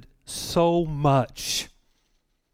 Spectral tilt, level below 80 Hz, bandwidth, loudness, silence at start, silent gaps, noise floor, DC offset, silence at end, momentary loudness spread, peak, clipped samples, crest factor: -5 dB/octave; -48 dBFS; 16.5 kHz; -24 LUFS; 0.3 s; none; -70 dBFS; under 0.1%; 0.85 s; 13 LU; -8 dBFS; under 0.1%; 16 dB